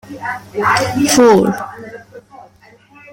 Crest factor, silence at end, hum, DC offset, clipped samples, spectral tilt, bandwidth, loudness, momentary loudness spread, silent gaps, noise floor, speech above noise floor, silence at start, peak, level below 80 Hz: 14 dB; 0.7 s; none; under 0.1%; under 0.1%; -4 dB/octave; 16.5 kHz; -13 LUFS; 21 LU; none; -46 dBFS; 32 dB; 0.1 s; 0 dBFS; -50 dBFS